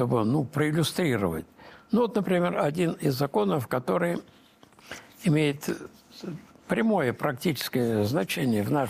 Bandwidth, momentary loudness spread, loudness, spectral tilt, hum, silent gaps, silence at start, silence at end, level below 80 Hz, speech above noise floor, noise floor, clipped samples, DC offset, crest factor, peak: 15.5 kHz; 15 LU; -27 LUFS; -6 dB/octave; none; none; 0 s; 0 s; -62 dBFS; 23 dB; -49 dBFS; under 0.1%; under 0.1%; 14 dB; -12 dBFS